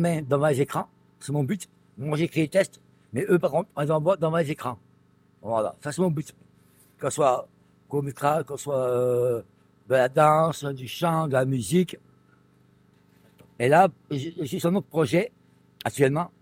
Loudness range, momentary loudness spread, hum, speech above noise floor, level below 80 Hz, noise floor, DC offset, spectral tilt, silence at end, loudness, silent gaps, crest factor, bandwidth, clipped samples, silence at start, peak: 5 LU; 12 LU; 50 Hz at -55 dBFS; 36 dB; -64 dBFS; -60 dBFS; under 0.1%; -6 dB/octave; 0.15 s; -25 LUFS; none; 20 dB; 16 kHz; under 0.1%; 0 s; -6 dBFS